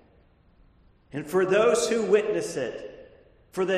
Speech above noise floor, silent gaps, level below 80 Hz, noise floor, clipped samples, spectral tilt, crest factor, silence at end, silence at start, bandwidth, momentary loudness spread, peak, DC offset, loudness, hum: 35 dB; none; -60 dBFS; -59 dBFS; under 0.1%; -4 dB/octave; 18 dB; 0 s; 1.15 s; 13 kHz; 18 LU; -8 dBFS; under 0.1%; -24 LUFS; none